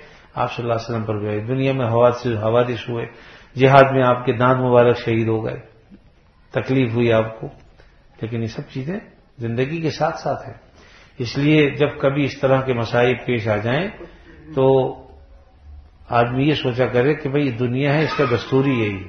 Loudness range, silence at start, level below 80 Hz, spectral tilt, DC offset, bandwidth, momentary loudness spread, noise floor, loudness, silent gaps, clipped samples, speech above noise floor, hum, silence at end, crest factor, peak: 7 LU; 0 s; -50 dBFS; -7.5 dB/octave; under 0.1%; 6.6 kHz; 14 LU; -52 dBFS; -19 LUFS; none; under 0.1%; 33 dB; none; 0 s; 20 dB; 0 dBFS